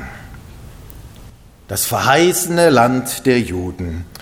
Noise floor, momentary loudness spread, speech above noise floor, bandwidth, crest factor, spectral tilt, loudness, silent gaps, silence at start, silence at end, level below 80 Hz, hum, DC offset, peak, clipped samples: -41 dBFS; 15 LU; 25 dB; over 20 kHz; 18 dB; -4 dB/octave; -15 LUFS; none; 0 s; 0 s; -42 dBFS; none; under 0.1%; 0 dBFS; under 0.1%